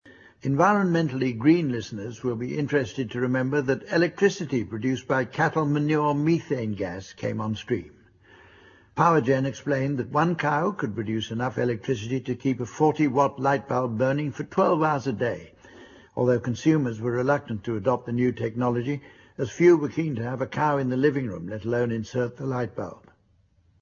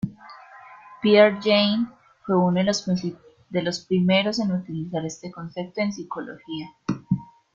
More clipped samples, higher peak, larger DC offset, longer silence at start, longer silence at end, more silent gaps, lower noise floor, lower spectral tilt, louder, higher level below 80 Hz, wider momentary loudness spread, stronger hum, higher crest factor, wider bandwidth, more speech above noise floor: neither; about the same, -6 dBFS vs -4 dBFS; neither; about the same, 0.05 s vs 0.05 s; first, 0.85 s vs 0.3 s; neither; first, -63 dBFS vs -46 dBFS; first, -7 dB/octave vs -5.5 dB/octave; about the same, -25 LUFS vs -23 LUFS; about the same, -60 dBFS vs -62 dBFS; second, 10 LU vs 16 LU; neither; about the same, 20 dB vs 20 dB; about the same, 7.2 kHz vs 7.6 kHz; first, 39 dB vs 24 dB